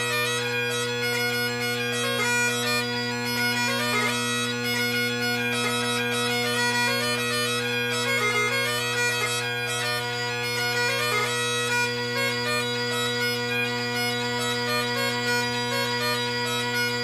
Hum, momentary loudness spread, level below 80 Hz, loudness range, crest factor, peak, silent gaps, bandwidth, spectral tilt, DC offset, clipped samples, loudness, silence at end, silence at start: none; 3 LU; -62 dBFS; 1 LU; 14 dB; -12 dBFS; none; 16 kHz; -2.5 dB/octave; under 0.1%; under 0.1%; -24 LUFS; 0 s; 0 s